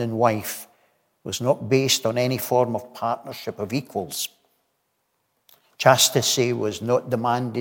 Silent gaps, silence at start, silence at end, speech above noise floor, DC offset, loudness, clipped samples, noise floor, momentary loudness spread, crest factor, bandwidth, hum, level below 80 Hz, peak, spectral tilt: none; 0 s; 0 s; 50 dB; under 0.1%; -22 LUFS; under 0.1%; -72 dBFS; 14 LU; 22 dB; 17 kHz; none; -68 dBFS; -2 dBFS; -3.5 dB/octave